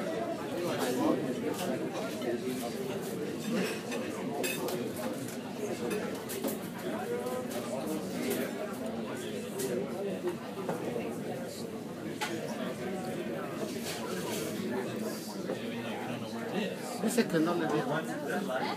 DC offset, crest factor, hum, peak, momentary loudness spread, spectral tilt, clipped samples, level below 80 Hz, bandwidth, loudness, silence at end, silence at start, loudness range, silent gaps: under 0.1%; 22 dB; none; -12 dBFS; 7 LU; -4.5 dB/octave; under 0.1%; -74 dBFS; 15.5 kHz; -35 LUFS; 0 s; 0 s; 3 LU; none